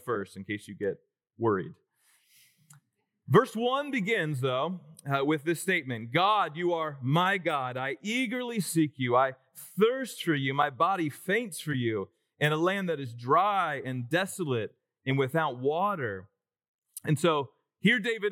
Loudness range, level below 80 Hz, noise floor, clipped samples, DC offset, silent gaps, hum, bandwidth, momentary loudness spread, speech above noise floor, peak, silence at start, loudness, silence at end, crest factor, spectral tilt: 3 LU; -84 dBFS; -71 dBFS; under 0.1%; under 0.1%; 16.68-16.82 s; none; 18 kHz; 11 LU; 42 dB; -8 dBFS; 0.05 s; -29 LUFS; 0 s; 20 dB; -5.5 dB/octave